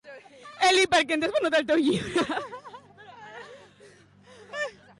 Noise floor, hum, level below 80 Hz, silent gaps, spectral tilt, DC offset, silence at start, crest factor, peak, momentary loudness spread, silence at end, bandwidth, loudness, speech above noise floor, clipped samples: -54 dBFS; none; -62 dBFS; none; -3 dB/octave; under 0.1%; 0.05 s; 16 dB; -12 dBFS; 25 LU; 0.3 s; 11.5 kHz; -24 LUFS; 29 dB; under 0.1%